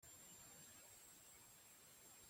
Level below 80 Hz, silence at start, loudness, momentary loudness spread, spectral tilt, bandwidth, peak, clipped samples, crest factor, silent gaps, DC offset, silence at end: -86 dBFS; 0 s; -61 LUFS; 3 LU; -1.5 dB/octave; 17 kHz; -50 dBFS; under 0.1%; 14 dB; none; under 0.1%; 0 s